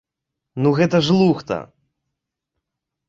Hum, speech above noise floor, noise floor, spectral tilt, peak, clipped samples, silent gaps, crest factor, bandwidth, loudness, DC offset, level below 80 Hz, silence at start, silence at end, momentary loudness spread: none; 65 dB; -82 dBFS; -7 dB/octave; -4 dBFS; under 0.1%; none; 16 dB; 7.8 kHz; -18 LUFS; under 0.1%; -56 dBFS; 0.55 s; 1.45 s; 12 LU